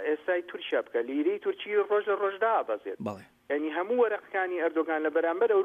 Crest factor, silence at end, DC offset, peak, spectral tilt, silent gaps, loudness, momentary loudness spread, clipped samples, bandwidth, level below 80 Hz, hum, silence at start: 14 dB; 0 s; under 0.1%; -14 dBFS; -6.5 dB/octave; none; -29 LUFS; 7 LU; under 0.1%; 7 kHz; -80 dBFS; none; 0 s